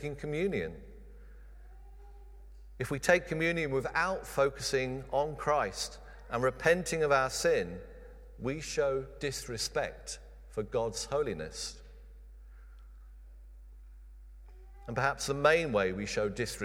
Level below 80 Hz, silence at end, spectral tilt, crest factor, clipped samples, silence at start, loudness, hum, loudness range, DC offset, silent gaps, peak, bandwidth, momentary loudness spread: -50 dBFS; 0 s; -4 dB/octave; 24 dB; under 0.1%; 0 s; -32 LUFS; none; 9 LU; under 0.1%; none; -10 dBFS; 16.5 kHz; 15 LU